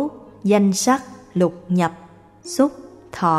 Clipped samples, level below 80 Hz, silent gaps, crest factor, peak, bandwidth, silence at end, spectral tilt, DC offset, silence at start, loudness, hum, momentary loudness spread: under 0.1%; -58 dBFS; none; 16 dB; -4 dBFS; 15 kHz; 0 s; -5.5 dB/octave; under 0.1%; 0 s; -20 LUFS; none; 12 LU